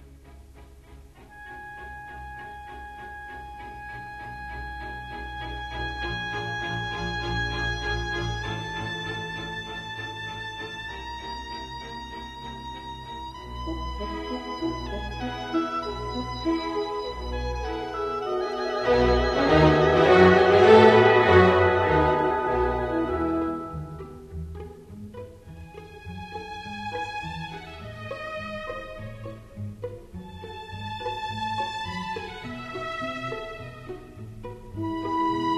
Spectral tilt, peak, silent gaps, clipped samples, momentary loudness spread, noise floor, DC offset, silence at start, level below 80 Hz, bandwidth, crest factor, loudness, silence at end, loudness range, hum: -6.5 dB/octave; -4 dBFS; none; under 0.1%; 22 LU; -48 dBFS; under 0.1%; 0 s; -40 dBFS; 12.5 kHz; 24 dB; -25 LUFS; 0 s; 19 LU; none